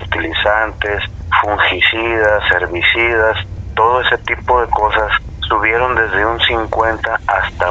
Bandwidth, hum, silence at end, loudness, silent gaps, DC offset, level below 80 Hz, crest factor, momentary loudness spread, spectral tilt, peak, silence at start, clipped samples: 8 kHz; none; 0 s; -14 LUFS; none; under 0.1%; -30 dBFS; 14 dB; 6 LU; -5.5 dB/octave; 0 dBFS; 0 s; under 0.1%